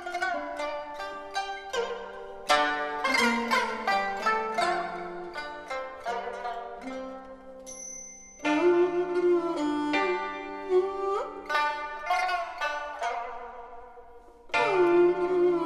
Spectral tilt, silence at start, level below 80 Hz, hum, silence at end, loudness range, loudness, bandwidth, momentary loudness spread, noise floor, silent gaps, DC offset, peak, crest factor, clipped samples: -3 dB/octave; 0 s; -60 dBFS; none; 0 s; 6 LU; -28 LUFS; 13.5 kHz; 15 LU; -49 dBFS; none; under 0.1%; -10 dBFS; 20 dB; under 0.1%